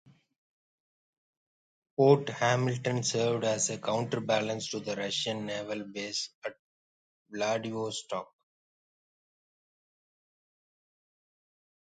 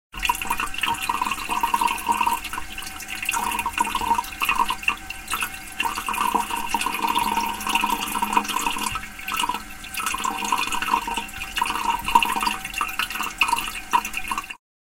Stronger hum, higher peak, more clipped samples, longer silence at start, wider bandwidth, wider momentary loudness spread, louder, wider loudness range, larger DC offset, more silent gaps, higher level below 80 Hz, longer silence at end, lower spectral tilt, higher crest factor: neither; second, -10 dBFS vs -2 dBFS; neither; first, 2 s vs 0.15 s; second, 9.6 kHz vs 17 kHz; first, 13 LU vs 7 LU; second, -30 LUFS vs -24 LUFS; first, 10 LU vs 1 LU; neither; first, 6.34-6.42 s, 6.59-7.26 s vs none; second, -76 dBFS vs -44 dBFS; first, 3.75 s vs 0.25 s; first, -4 dB/octave vs -1 dB/octave; about the same, 24 dB vs 22 dB